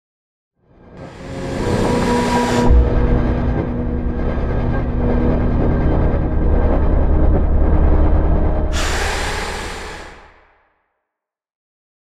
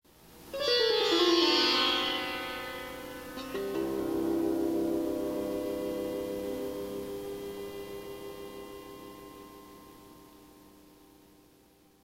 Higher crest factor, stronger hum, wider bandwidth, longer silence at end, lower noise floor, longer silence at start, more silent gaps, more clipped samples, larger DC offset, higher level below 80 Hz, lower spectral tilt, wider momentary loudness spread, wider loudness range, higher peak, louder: second, 14 dB vs 20 dB; neither; second, 12.5 kHz vs 16 kHz; first, 1.7 s vs 1.15 s; first, -82 dBFS vs -62 dBFS; first, 0.85 s vs 0.25 s; neither; neither; first, 0.8% vs under 0.1%; first, -18 dBFS vs -60 dBFS; first, -6.5 dB/octave vs -3.5 dB/octave; second, 11 LU vs 22 LU; second, 5 LU vs 20 LU; first, -2 dBFS vs -14 dBFS; first, -18 LUFS vs -30 LUFS